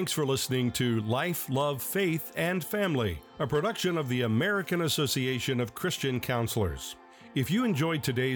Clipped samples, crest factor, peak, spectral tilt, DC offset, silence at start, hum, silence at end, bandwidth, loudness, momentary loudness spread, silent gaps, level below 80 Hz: under 0.1%; 12 dB; -16 dBFS; -5 dB/octave; under 0.1%; 0 s; none; 0 s; 19.5 kHz; -29 LUFS; 4 LU; none; -56 dBFS